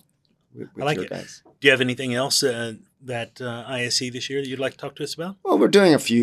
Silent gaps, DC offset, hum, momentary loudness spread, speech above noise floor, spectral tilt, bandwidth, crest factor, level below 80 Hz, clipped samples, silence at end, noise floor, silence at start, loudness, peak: none; under 0.1%; none; 16 LU; 44 dB; -4 dB/octave; 14 kHz; 22 dB; -70 dBFS; under 0.1%; 0 s; -66 dBFS; 0.55 s; -22 LUFS; 0 dBFS